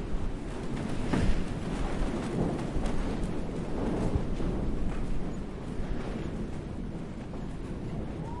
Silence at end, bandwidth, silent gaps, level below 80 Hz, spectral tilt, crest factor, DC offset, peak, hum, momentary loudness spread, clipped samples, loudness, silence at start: 0 s; 11.5 kHz; none; -36 dBFS; -7 dB/octave; 16 dB; under 0.1%; -14 dBFS; none; 7 LU; under 0.1%; -35 LUFS; 0 s